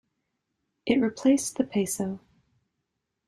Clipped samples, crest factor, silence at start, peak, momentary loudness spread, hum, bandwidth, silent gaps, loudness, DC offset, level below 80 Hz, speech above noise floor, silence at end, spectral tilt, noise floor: under 0.1%; 20 dB; 0.85 s; -10 dBFS; 12 LU; none; 15 kHz; none; -26 LUFS; under 0.1%; -66 dBFS; 56 dB; 1.1 s; -4.5 dB/octave; -81 dBFS